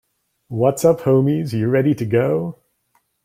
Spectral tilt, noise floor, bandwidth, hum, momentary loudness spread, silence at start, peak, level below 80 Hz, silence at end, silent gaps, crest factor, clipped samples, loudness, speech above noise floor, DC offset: -7.5 dB/octave; -65 dBFS; 16.5 kHz; none; 7 LU; 0.5 s; -2 dBFS; -56 dBFS; 0.7 s; none; 16 dB; under 0.1%; -18 LUFS; 48 dB; under 0.1%